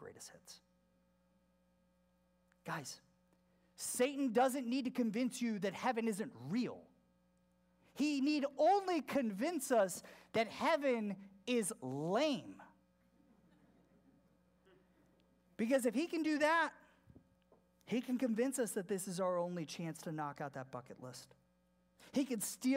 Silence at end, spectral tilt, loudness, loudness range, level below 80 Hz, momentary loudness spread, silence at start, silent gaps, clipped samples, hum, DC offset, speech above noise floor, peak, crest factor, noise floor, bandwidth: 0 s; -4.5 dB/octave; -38 LUFS; 8 LU; -82 dBFS; 16 LU; 0 s; none; under 0.1%; none; under 0.1%; 38 dB; -22 dBFS; 18 dB; -75 dBFS; 16 kHz